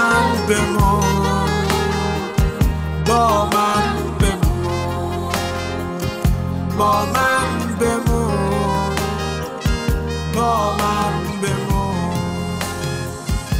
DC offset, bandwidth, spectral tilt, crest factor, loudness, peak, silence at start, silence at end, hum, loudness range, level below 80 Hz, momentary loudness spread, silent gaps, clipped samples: under 0.1%; 16 kHz; -5.5 dB/octave; 14 dB; -19 LUFS; -4 dBFS; 0 s; 0 s; none; 3 LU; -26 dBFS; 7 LU; none; under 0.1%